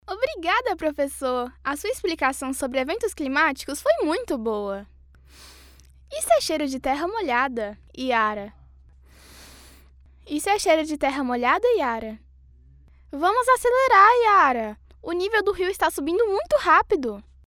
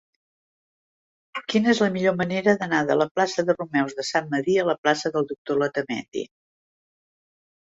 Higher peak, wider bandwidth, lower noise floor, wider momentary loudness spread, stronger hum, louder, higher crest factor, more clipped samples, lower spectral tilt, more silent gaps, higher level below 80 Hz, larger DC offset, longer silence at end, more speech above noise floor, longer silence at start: about the same, -4 dBFS vs -4 dBFS; first, 18 kHz vs 8 kHz; second, -51 dBFS vs under -90 dBFS; first, 14 LU vs 9 LU; neither; about the same, -22 LUFS vs -23 LUFS; about the same, 20 dB vs 20 dB; neither; second, -3 dB/octave vs -5 dB/octave; second, none vs 3.11-3.15 s, 4.78-4.83 s, 5.38-5.45 s, 6.08-6.12 s; first, -50 dBFS vs -66 dBFS; neither; second, 0.25 s vs 1.4 s; second, 29 dB vs over 67 dB; second, 0.1 s vs 1.35 s